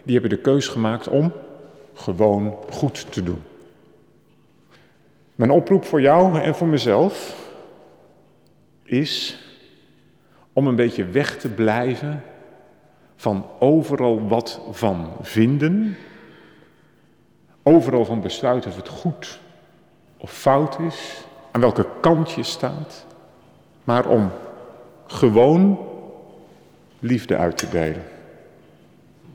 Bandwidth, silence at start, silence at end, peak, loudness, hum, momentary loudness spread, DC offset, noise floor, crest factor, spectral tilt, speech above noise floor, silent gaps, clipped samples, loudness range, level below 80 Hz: 17.5 kHz; 0.05 s; 0.05 s; -4 dBFS; -20 LUFS; none; 19 LU; under 0.1%; -56 dBFS; 18 dB; -6.5 dB/octave; 38 dB; none; under 0.1%; 7 LU; -54 dBFS